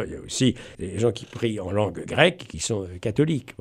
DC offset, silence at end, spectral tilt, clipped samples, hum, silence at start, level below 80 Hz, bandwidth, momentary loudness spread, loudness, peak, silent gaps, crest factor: under 0.1%; 0.1 s; -5 dB/octave; under 0.1%; none; 0 s; -50 dBFS; 14 kHz; 9 LU; -25 LUFS; -2 dBFS; none; 22 dB